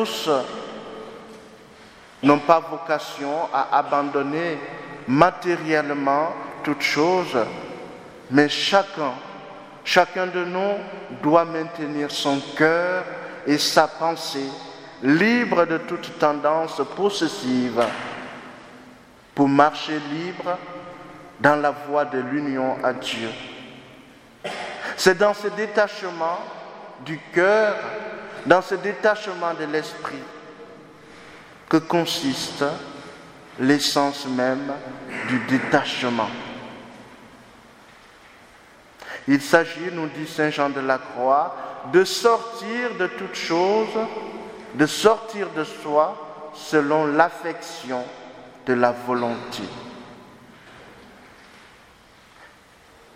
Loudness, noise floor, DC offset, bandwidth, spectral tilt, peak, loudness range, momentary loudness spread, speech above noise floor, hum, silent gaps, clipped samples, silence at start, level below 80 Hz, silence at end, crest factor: -22 LUFS; -51 dBFS; under 0.1%; 16 kHz; -4.5 dB/octave; 0 dBFS; 5 LU; 19 LU; 29 dB; none; none; under 0.1%; 0 s; -64 dBFS; 0.7 s; 22 dB